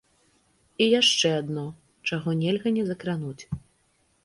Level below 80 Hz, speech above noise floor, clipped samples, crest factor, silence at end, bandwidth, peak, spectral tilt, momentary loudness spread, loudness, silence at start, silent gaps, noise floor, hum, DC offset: -58 dBFS; 42 dB; under 0.1%; 18 dB; 0.65 s; 11.5 kHz; -8 dBFS; -4 dB/octave; 19 LU; -25 LUFS; 0.8 s; none; -67 dBFS; none; under 0.1%